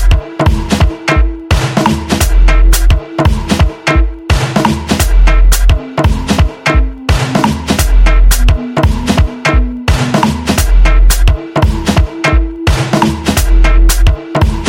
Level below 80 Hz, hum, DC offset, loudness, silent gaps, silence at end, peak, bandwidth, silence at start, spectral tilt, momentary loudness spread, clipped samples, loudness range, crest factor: -10 dBFS; none; under 0.1%; -12 LUFS; none; 0 s; 0 dBFS; 17 kHz; 0 s; -5 dB/octave; 4 LU; under 0.1%; 0 LU; 8 dB